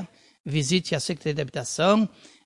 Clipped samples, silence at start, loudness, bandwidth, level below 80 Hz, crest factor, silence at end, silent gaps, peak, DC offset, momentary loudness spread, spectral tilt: under 0.1%; 0 s; -25 LUFS; 11.5 kHz; -58 dBFS; 20 dB; 0.4 s; 0.40-0.44 s; -6 dBFS; under 0.1%; 9 LU; -4.5 dB/octave